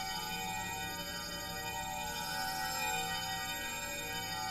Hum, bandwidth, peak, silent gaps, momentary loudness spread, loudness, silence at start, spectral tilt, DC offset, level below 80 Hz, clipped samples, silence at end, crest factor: none; 16 kHz; -24 dBFS; none; 5 LU; -37 LUFS; 0 s; -1.5 dB/octave; under 0.1%; -56 dBFS; under 0.1%; 0 s; 16 dB